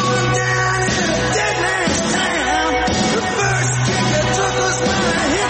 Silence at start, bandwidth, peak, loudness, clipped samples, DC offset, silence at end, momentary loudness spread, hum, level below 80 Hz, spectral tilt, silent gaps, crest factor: 0 s; 8.8 kHz; -6 dBFS; -16 LUFS; under 0.1%; under 0.1%; 0 s; 1 LU; none; -36 dBFS; -3.5 dB/octave; none; 12 dB